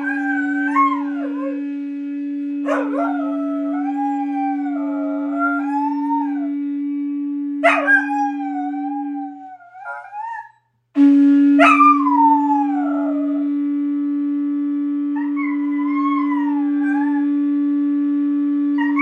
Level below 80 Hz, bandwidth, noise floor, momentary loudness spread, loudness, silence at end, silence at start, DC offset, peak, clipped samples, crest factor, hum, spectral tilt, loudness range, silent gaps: -78 dBFS; 6.6 kHz; -51 dBFS; 13 LU; -18 LUFS; 0 s; 0 s; under 0.1%; -2 dBFS; under 0.1%; 18 dB; none; -4.5 dB/octave; 7 LU; none